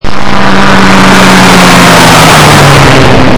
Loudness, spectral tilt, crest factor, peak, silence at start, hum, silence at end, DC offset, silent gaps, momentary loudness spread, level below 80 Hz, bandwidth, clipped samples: -1 LUFS; -4 dB/octave; 4 dB; 0 dBFS; 0 s; none; 0 s; under 0.1%; none; 5 LU; -20 dBFS; 12 kHz; 80%